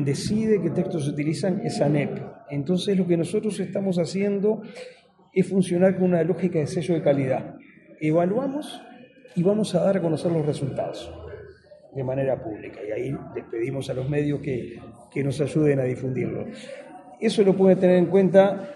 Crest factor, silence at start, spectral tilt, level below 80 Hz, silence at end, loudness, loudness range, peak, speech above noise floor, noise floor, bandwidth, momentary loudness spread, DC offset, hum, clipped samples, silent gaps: 20 dB; 0 s; -7 dB/octave; -58 dBFS; 0 s; -24 LUFS; 6 LU; -4 dBFS; 25 dB; -48 dBFS; 11.5 kHz; 18 LU; under 0.1%; none; under 0.1%; none